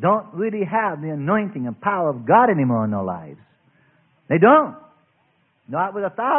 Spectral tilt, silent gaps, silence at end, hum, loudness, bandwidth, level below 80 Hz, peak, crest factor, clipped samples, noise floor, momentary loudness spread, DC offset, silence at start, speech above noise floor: -12 dB/octave; none; 0 s; none; -20 LUFS; 3.6 kHz; -64 dBFS; -2 dBFS; 20 dB; under 0.1%; -64 dBFS; 13 LU; under 0.1%; 0 s; 45 dB